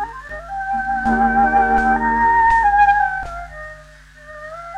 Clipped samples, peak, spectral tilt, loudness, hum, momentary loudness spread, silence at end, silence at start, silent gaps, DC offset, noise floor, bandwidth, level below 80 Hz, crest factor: under 0.1%; -4 dBFS; -6 dB/octave; -16 LUFS; none; 20 LU; 0 s; 0 s; none; under 0.1%; -42 dBFS; 9.6 kHz; -36 dBFS; 14 dB